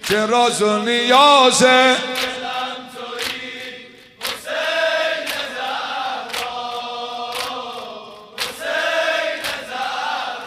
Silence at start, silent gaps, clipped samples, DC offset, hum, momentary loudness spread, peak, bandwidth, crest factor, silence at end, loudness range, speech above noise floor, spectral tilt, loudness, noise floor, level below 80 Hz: 0 s; none; under 0.1%; under 0.1%; none; 18 LU; 0 dBFS; 15.5 kHz; 20 dB; 0 s; 10 LU; 26 dB; -2 dB/octave; -18 LUFS; -40 dBFS; -60 dBFS